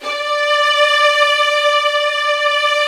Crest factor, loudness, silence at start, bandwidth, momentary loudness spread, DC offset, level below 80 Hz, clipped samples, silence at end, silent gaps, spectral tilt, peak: 14 dB; -13 LUFS; 0 s; 14 kHz; 4 LU; under 0.1%; -70 dBFS; under 0.1%; 0 s; none; 3 dB/octave; 0 dBFS